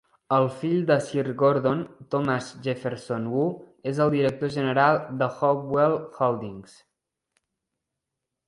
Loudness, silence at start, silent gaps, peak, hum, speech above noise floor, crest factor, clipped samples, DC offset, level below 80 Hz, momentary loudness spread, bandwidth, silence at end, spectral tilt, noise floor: -25 LUFS; 0.3 s; none; -8 dBFS; none; 60 dB; 18 dB; under 0.1%; under 0.1%; -64 dBFS; 9 LU; 11.5 kHz; 1.85 s; -7 dB/octave; -84 dBFS